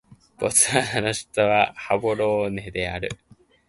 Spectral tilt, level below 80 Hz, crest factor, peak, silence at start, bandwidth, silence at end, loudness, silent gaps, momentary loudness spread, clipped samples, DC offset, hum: -3 dB/octave; -50 dBFS; 22 dB; -2 dBFS; 0.4 s; 12 kHz; 0.55 s; -22 LUFS; none; 11 LU; under 0.1%; under 0.1%; none